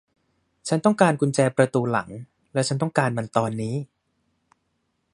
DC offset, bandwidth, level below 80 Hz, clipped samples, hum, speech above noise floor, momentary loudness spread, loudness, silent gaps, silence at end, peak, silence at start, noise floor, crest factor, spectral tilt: under 0.1%; 11.5 kHz; -64 dBFS; under 0.1%; none; 51 dB; 15 LU; -23 LUFS; none; 1.3 s; -2 dBFS; 0.65 s; -73 dBFS; 22 dB; -6 dB/octave